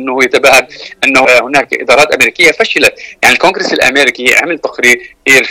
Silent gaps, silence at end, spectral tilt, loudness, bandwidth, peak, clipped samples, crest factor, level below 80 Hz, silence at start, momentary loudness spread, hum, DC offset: none; 0 s; -2 dB/octave; -7 LUFS; over 20 kHz; 0 dBFS; 2%; 8 dB; -44 dBFS; 0 s; 5 LU; none; 0.2%